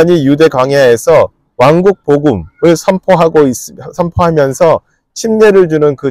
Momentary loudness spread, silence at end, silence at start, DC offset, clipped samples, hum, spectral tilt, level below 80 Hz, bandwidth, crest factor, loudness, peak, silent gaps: 9 LU; 0 s; 0 s; under 0.1%; under 0.1%; none; -6 dB/octave; -38 dBFS; 15.5 kHz; 8 dB; -9 LUFS; 0 dBFS; none